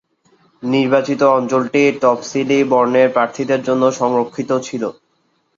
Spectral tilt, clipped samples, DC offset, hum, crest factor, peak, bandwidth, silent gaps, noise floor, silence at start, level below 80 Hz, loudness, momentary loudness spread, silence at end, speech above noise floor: -5.5 dB/octave; under 0.1%; under 0.1%; none; 14 dB; -2 dBFS; 7.6 kHz; none; -63 dBFS; 0.6 s; -62 dBFS; -16 LUFS; 7 LU; 0.65 s; 48 dB